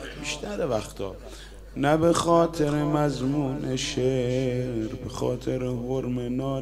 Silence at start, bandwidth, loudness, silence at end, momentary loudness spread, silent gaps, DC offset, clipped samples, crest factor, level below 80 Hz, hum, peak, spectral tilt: 0 s; 15.5 kHz; -26 LUFS; 0 s; 13 LU; none; under 0.1%; under 0.1%; 18 dB; -44 dBFS; none; -8 dBFS; -6 dB/octave